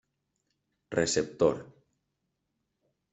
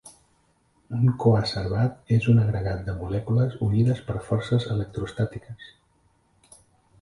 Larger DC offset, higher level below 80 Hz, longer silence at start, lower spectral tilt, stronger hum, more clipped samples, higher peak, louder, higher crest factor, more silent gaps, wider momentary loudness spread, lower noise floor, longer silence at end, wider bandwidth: neither; second, -64 dBFS vs -46 dBFS; first, 0.9 s vs 0.05 s; second, -4 dB/octave vs -8 dB/octave; neither; neither; second, -10 dBFS vs -6 dBFS; second, -29 LUFS vs -25 LUFS; first, 24 dB vs 18 dB; neither; about the same, 8 LU vs 10 LU; first, -81 dBFS vs -65 dBFS; about the same, 1.45 s vs 1.35 s; second, 8.2 kHz vs 11.5 kHz